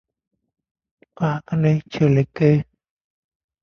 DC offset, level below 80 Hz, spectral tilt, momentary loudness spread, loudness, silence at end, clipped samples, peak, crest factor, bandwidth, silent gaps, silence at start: under 0.1%; -54 dBFS; -9 dB/octave; 7 LU; -20 LUFS; 1 s; under 0.1%; -4 dBFS; 18 dB; 6.6 kHz; none; 1.2 s